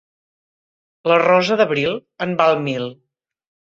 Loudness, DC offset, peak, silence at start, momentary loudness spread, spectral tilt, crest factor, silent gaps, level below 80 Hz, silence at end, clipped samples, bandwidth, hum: -18 LUFS; under 0.1%; -2 dBFS; 1.05 s; 12 LU; -5.5 dB/octave; 18 dB; none; -62 dBFS; 0.75 s; under 0.1%; 7.8 kHz; none